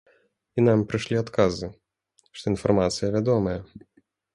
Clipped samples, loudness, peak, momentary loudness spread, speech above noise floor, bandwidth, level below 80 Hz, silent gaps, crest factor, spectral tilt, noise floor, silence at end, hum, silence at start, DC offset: under 0.1%; -24 LUFS; -6 dBFS; 13 LU; 44 dB; 11.5 kHz; -50 dBFS; none; 20 dB; -6.5 dB/octave; -67 dBFS; 0.55 s; none; 0.55 s; under 0.1%